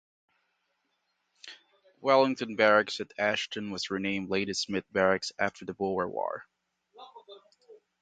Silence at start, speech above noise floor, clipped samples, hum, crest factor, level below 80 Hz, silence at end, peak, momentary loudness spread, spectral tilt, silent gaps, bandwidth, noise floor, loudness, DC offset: 1.45 s; 49 dB; under 0.1%; none; 24 dB; -68 dBFS; 0.3 s; -8 dBFS; 18 LU; -4 dB/octave; none; 9.2 kHz; -78 dBFS; -29 LUFS; under 0.1%